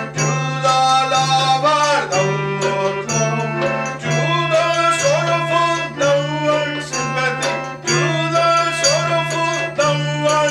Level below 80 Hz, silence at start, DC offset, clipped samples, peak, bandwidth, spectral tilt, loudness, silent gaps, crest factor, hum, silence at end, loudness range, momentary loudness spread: -56 dBFS; 0 s; under 0.1%; under 0.1%; -4 dBFS; 14 kHz; -3.5 dB/octave; -17 LUFS; none; 14 dB; none; 0 s; 2 LU; 5 LU